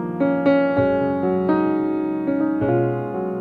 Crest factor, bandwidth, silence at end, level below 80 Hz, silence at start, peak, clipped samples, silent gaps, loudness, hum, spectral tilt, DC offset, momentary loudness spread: 14 dB; 4.9 kHz; 0 s; -52 dBFS; 0 s; -6 dBFS; under 0.1%; none; -20 LUFS; none; -10 dB/octave; under 0.1%; 5 LU